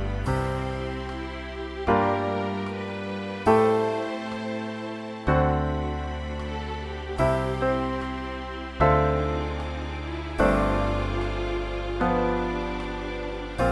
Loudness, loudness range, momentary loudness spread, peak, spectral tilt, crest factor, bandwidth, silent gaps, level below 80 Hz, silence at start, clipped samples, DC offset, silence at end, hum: -27 LUFS; 3 LU; 11 LU; -8 dBFS; -7 dB/octave; 18 dB; 12 kHz; none; -36 dBFS; 0 s; under 0.1%; under 0.1%; 0 s; none